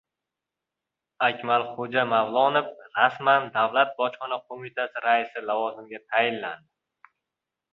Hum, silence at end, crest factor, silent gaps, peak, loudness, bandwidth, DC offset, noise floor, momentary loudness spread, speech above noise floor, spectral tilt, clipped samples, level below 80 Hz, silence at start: none; 1.15 s; 22 dB; none; -4 dBFS; -25 LUFS; 5.4 kHz; under 0.1%; -87 dBFS; 11 LU; 62 dB; -6.5 dB/octave; under 0.1%; -76 dBFS; 1.2 s